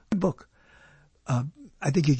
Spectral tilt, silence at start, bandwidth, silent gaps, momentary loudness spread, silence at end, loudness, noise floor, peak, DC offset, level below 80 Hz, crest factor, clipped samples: -7 dB/octave; 0.1 s; 8.8 kHz; none; 16 LU; 0 s; -29 LUFS; -57 dBFS; -10 dBFS; under 0.1%; -54 dBFS; 18 dB; under 0.1%